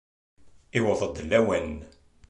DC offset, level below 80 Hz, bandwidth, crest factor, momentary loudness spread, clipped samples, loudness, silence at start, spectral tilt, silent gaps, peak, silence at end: under 0.1%; -48 dBFS; 11 kHz; 20 dB; 12 LU; under 0.1%; -26 LUFS; 0.45 s; -5.5 dB/octave; none; -8 dBFS; 0.4 s